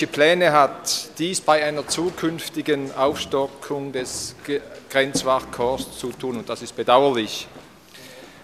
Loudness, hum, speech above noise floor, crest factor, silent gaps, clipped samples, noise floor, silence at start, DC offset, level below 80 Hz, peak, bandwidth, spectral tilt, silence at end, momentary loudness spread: -22 LUFS; none; 23 dB; 22 dB; none; under 0.1%; -45 dBFS; 0 s; under 0.1%; -54 dBFS; -2 dBFS; 15 kHz; -3.5 dB/octave; 0.05 s; 13 LU